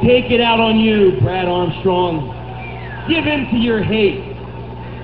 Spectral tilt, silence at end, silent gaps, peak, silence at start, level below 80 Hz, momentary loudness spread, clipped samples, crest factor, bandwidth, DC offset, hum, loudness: -10 dB/octave; 0 s; none; -2 dBFS; 0 s; -36 dBFS; 16 LU; under 0.1%; 14 dB; 5 kHz; 0.7%; 60 Hz at -30 dBFS; -15 LUFS